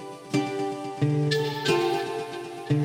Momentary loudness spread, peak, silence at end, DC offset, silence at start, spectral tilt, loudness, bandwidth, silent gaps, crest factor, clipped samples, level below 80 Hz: 9 LU; -10 dBFS; 0 s; under 0.1%; 0 s; -6 dB/octave; -27 LUFS; 16.5 kHz; none; 16 dB; under 0.1%; -66 dBFS